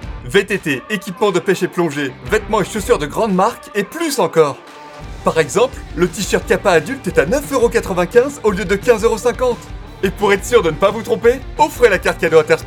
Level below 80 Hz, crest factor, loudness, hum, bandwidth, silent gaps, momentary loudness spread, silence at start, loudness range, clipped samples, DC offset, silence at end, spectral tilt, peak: -34 dBFS; 16 dB; -16 LUFS; none; 18 kHz; none; 8 LU; 0 s; 2 LU; under 0.1%; under 0.1%; 0 s; -4.5 dB/octave; 0 dBFS